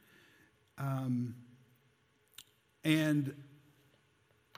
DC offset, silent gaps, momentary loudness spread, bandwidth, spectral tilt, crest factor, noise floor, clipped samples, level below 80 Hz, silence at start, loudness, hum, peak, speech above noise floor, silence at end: under 0.1%; none; 26 LU; 16 kHz; -6 dB/octave; 24 dB; -72 dBFS; under 0.1%; -78 dBFS; 0.75 s; -35 LUFS; none; -16 dBFS; 39 dB; 1.1 s